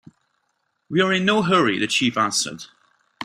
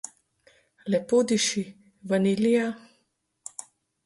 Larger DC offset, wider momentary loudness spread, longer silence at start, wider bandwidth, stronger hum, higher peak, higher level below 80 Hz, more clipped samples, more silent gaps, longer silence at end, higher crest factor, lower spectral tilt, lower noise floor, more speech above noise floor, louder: neither; second, 8 LU vs 20 LU; about the same, 0.9 s vs 0.85 s; first, 15.5 kHz vs 11.5 kHz; neither; first, -4 dBFS vs -10 dBFS; first, -62 dBFS vs -70 dBFS; neither; neither; second, 0 s vs 1.25 s; about the same, 18 dB vs 16 dB; about the same, -3.5 dB/octave vs -4.5 dB/octave; about the same, -72 dBFS vs -73 dBFS; about the same, 52 dB vs 49 dB; first, -20 LUFS vs -25 LUFS